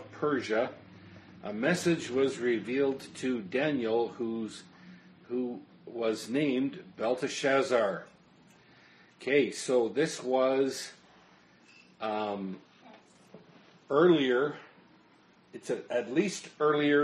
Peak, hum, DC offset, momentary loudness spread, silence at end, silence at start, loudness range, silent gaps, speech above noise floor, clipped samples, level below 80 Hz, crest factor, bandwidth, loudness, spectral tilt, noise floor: -10 dBFS; none; under 0.1%; 15 LU; 0 s; 0 s; 4 LU; none; 32 dB; under 0.1%; -76 dBFS; 20 dB; 11.5 kHz; -30 LUFS; -5 dB/octave; -62 dBFS